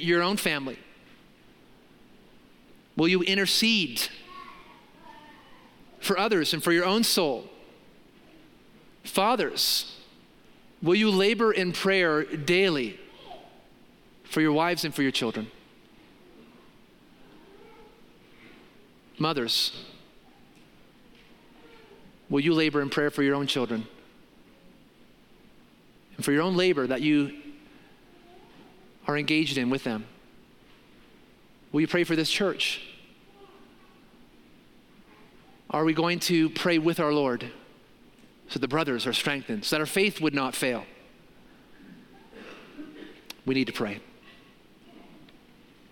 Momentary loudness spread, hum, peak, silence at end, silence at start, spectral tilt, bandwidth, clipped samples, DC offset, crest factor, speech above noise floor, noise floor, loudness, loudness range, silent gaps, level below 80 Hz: 22 LU; none; -8 dBFS; 0.85 s; 0 s; -4 dB/octave; 17 kHz; under 0.1%; under 0.1%; 22 dB; 32 dB; -57 dBFS; -26 LUFS; 8 LU; none; -64 dBFS